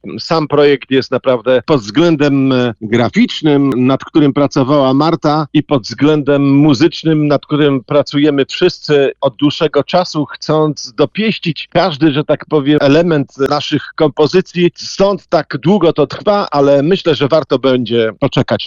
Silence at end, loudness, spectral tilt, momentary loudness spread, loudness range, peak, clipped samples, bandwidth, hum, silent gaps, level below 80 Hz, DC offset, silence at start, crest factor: 0 s; -12 LUFS; -6.5 dB/octave; 5 LU; 2 LU; 0 dBFS; under 0.1%; 7.4 kHz; none; none; -46 dBFS; under 0.1%; 0.05 s; 10 dB